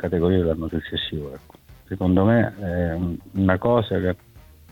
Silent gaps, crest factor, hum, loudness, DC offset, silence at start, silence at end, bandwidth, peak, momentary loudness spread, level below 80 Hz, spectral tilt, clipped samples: none; 18 dB; none; -22 LUFS; under 0.1%; 0 s; 0.3 s; 16.5 kHz; -4 dBFS; 14 LU; -42 dBFS; -8.5 dB/octave; under 0.1%